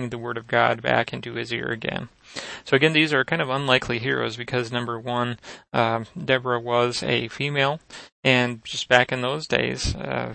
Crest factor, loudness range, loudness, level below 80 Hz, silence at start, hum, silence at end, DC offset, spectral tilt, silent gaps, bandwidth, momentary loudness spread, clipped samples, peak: 24 dB; 2 LU; -23 LUFS; -46 dBFS; 0 s; none; 0 s; under 0.1%; -4.5 dB/octave; 8.12-8.23 s; 8.8 kHz; 11 LU; under 0.1%; 0 dBFS